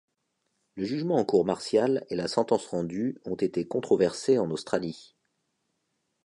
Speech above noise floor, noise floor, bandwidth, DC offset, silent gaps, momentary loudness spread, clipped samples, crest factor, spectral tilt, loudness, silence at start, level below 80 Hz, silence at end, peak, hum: 51 dB; -78 dBFS; 11 kHz; under 0.1%; none; 8 LU; under 0.1%; 18 dB; -6 dB/octave; -27 LUFS; 0.75 s; -66 dBFS; 1.2 s; -10 dBFS; none